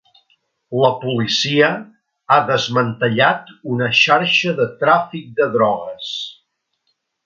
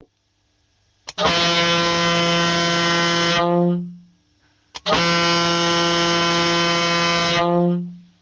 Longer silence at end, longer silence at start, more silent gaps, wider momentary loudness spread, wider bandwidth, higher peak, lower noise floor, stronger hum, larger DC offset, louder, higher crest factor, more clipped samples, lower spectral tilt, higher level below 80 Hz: first, 0.95 s vs 0.2 s; second, 0.7 s vs 1.05 s; neither; first, 12 LU vs 6 LU; second, 7.6 kHz vs 9.8 kHz; first, 0 dBFS vs -6 dBFS; first, -70 dBFS vs -66 dBFS; neither; neither; about the same, -16 LUFS vs -17 LUFS; about the same, 18 dB vs 14 dB; neither; about the same, -4.5 dB/octave vs -3.5 dB/octave; second, -64 dBFS vs -50 dBFS